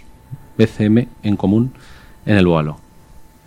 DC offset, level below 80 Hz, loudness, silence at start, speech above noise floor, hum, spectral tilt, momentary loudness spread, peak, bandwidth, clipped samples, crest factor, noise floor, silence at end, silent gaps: under 0.1%; -44 dBFS; -17 LUFS; 0.3 s; 27 dB; none; -8.5 dB/octave; 20 LU; 0 dBFS; 11 kHz; under 0.1%; 18 dB; -42 dBFS; 0.25 s; none